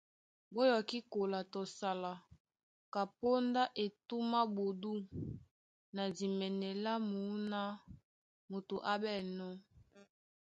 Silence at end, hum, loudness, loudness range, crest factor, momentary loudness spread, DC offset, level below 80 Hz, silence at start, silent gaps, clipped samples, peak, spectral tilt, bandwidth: 0.45 s; none; -39 LUFS; 3 LU; 20 dB; 13 LU; under 0.1%; -72 dBFS; 0.5 s; 2.40-2.45 s, 2.63-2.92 s, 5.51-5.93 s, 8.04-8.48 s; under 0.1%; -20 dBFS; -6 dB/octave; 9 kHz